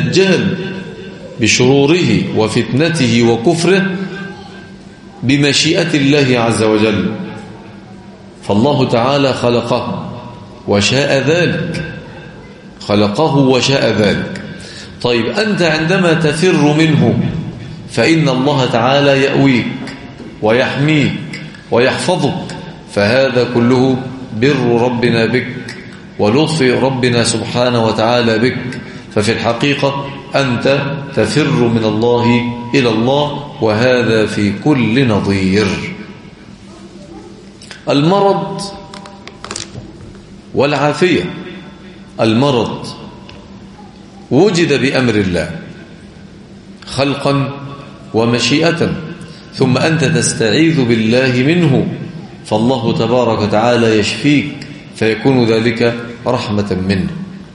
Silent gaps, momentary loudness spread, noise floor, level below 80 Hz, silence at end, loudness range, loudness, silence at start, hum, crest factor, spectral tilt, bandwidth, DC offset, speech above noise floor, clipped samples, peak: none; 18 LU; -35 dBFS; -44 dBFS; 0 s; 4 LU; -13 LUFS; 0 s; none; 14 dB; -5.5 dB/octave; 11.5 kHz; under 0.1%; 23 dB; under 0.1%; 0 dBFS